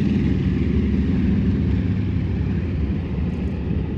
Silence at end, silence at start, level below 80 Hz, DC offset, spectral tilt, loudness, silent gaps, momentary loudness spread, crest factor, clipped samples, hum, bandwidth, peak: 0 s; 0 s; -28 dBFS; under 0.1%; -10 dB/octave; -22 LUFS; none; 5 LU; 12 dB; under 0.1%; none; 6.2 kHz; -8 dBFS